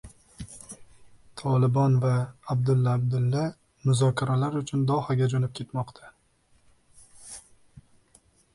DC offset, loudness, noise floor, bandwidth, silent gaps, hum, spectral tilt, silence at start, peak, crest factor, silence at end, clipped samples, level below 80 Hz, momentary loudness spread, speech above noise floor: under 0.1%; -26 LUFS; -64 dBFS; 11.5 kHz; none; none; -7 dB/octave; 0.05 s; -12 dBFS; 16 dB; 0.75 s; under 0.1%; -58 dBFS; 21 LU; 40 dB